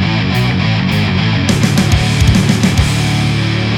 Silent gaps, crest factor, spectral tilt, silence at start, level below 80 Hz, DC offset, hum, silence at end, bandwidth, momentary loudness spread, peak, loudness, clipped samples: none; 12 dB; -5.5 dB/octave; 0 s; -24 dBFS; under 0.1%; none; 0 s; 17 kHz; 3 LU; 0 dBFS; -12 LUFS; under 0.1%